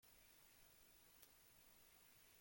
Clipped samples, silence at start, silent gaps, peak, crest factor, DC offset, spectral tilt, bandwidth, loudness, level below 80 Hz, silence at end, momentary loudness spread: under 0.1%; 0 s; none; -40 dBFS; 30 dB; under 0.1%; -1.5 dB/octave; 16.5 kHz; -68 LUFS; -84 dBFS; 0 s; 1 LU